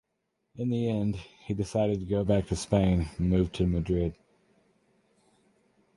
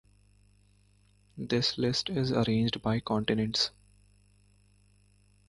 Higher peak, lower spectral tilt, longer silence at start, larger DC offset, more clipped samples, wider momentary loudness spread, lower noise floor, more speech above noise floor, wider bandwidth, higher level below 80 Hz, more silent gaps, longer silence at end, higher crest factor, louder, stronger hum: about the same, -10 dBFS vs -12 dBFS; first, -7.5 dB/octave vs -5.5 dB/octave; second, 0.55 s vs 1.35 s; neither; neither; first, 8 LU vs 4 LU; first, -79 dBFS vs -64 dBFS; first, 52 dB vs 35 dB; about the same, 11.5 kHz vs 11.5 kHz; first, -42 dBFS vs -58 dBFS; neither; about the same, 1.85 s vs 1.8 s; about the same, 20 dB vs 20 dB; about the same, -29 LUFS vs -29 LUFS; second, none vs 50 Hz at -55 dBFS